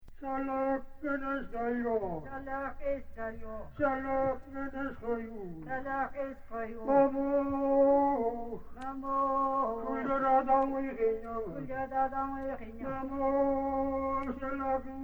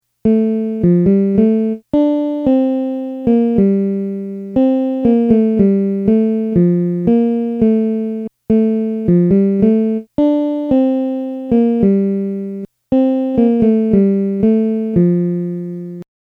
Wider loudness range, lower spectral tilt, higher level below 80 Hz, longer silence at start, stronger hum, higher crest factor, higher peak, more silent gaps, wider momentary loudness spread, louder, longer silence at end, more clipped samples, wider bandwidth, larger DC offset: first, 6 LU vs 2 LU; second, -8.5 dB/octave vs -11.5 dB/octave; second, -50 dBFS vs -44 dBFS; second, 0 s vs 0.25 s; neither; about the same, 18 dB vs 14 dB; second, -14 dBFS vs 0 dBFS; neither; first, 13 LU vs 9 LU; second, -33 LUFS vs -15 LUFS; second, 0 s vs 0.35 s; neither; first, 4.7 kHz vs 4 kHz; neither